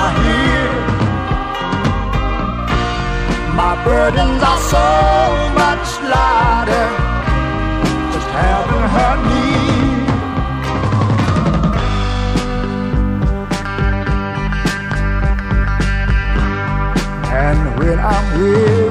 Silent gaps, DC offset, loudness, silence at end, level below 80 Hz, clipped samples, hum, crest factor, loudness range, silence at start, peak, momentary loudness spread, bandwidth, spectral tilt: none; under 0.1%; -15 LUFS; 0 s; -20 dBFS; under 0.1%; none; 14 dB; 4 LU; 0 s; 0 dBFS; 6 LU; 14.5 kHz; -6 dB/octave